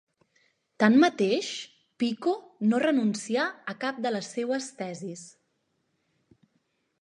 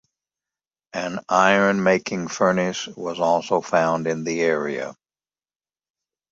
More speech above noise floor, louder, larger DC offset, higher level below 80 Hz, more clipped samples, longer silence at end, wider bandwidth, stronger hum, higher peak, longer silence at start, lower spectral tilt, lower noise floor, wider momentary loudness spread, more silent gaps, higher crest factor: second, 49 dB vs over 69 dB; second, -27 LUFS vs -21 LUFS; neither; second, -82 dBFS vs -64 dBFS; neither; first, 1.7 s vs 1.4 s; first, 11 kHz vs 7.8 kHz; neither; second, -6 dBFS vs 0 dBFS; second, 0.8 s vs 0.95 s; about the same, -5 dB/octave vs -4.5 dB/octave; second, -75 dBFS vs under -90 dBFS; first, 16 LU vs 12 LU; neither; about the same, 22 dB vs 22 dB